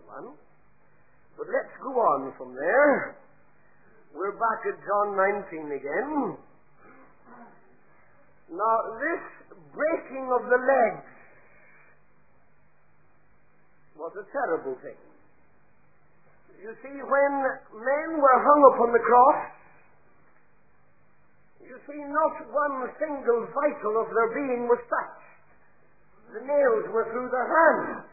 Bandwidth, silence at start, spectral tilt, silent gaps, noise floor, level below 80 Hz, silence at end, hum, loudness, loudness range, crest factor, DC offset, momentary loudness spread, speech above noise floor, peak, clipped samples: 2.6 kHz; 0.1 s; -11.5 dB/octave; none; -65 dBFS; -72 dBFS; 0.05 s; none; -25 LUFS; 15 LU; 24 dB; 0.2%; 21 LU; 40 dB; -4 dBFS; under 0.1%